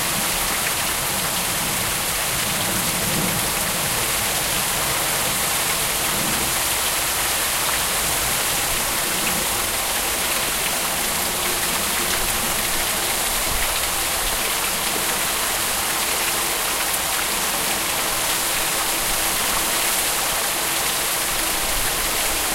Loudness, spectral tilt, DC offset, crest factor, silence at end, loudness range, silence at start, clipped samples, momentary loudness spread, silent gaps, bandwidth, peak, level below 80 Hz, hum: -19 LUFS; -1 dB/octave; under 0.1%; 18 dB; 0 s; 1 LU; 0 s; under 0.1%; 1 LU; none; 16 kHz; -4 dBFS; -38 dBFS; none